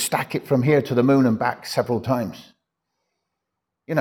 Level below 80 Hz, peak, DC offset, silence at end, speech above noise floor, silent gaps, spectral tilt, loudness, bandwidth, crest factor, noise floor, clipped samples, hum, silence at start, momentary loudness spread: -64 dBFS; -6 dBFS; under 0.1%; 0 s; 61 dB; none; -6 dB/octave; -21 LUFS; 18.5 kHz; 16 dB; -81 dBFS; under 0.1%; none; 0 s; 8 LU